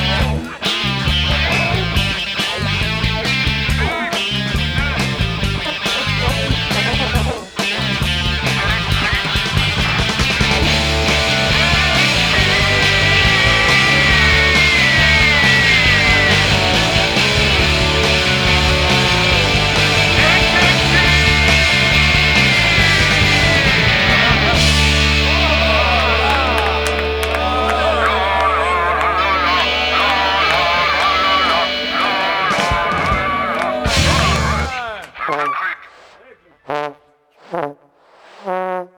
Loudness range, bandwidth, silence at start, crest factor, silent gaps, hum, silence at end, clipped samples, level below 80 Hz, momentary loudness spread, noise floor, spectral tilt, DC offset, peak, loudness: 7 LU; 19.5 kHz; 0 s; 14 dB; none; none; 0.1 s; under 0.1%; -26 dBFS; 8 LU; -51 dBFS; -3.5 dB/octave; under 0.1%; 0 dBFS; -13 LUFS